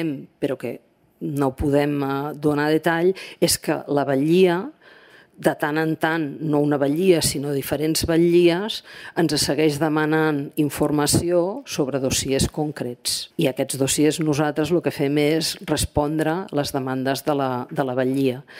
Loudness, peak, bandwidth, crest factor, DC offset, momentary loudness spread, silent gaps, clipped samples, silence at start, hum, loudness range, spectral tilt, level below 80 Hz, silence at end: -21 LUFS; -2 dBFS; 16 kHz; 18 dB; under 0.1%; 8 LU; none; under 0.1%; 0 s; none; 2 LU; -4.5 dB/octave; -44 dBFS; 0 s